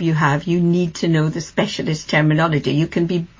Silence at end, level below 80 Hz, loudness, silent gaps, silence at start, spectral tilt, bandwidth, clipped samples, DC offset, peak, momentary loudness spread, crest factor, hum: 0.15 s; -48 dBFS; -18 LUFS; none; 0 s; -6.5 dB/octave; 7.6 kHz; under 0.1%; under 0.1%; -4 dBFS; 5 LU; 14 dB; none